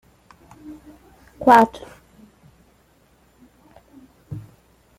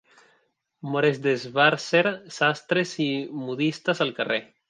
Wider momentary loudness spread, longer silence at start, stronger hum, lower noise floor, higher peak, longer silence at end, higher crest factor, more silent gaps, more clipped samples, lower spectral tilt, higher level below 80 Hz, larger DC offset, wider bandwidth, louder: first, 29 LU vs 8 LU; second, 0.7 s vs 0.85 s; neither; second, -58 dBFS vs -69 dBFS; first, 0 dBFS vs -4 dBFS; first, 0.6 s vs 0.25 s; about the same, 24 dB vs 22 dB; neither; neither; about the same, -6 dB/octave vs -5 dB/octave; first, -56 dBFS vs -74 dBFS; neither; first, 16 kHz vs 9.8 kHz; first, -16 LUFS vs -24 LUFS